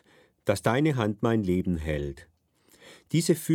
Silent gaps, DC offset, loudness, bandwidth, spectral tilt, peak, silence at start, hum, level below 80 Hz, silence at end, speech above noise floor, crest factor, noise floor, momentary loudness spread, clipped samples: none; under 0.1%; -27 LUFS; 18.5 kHz; -6 dB/octave; -8 dBFS; 0.45 s; none; -46 dBFS; 0 s; 37 dB; 20 dB; -63 dBFS; 9 LU; under 0.1%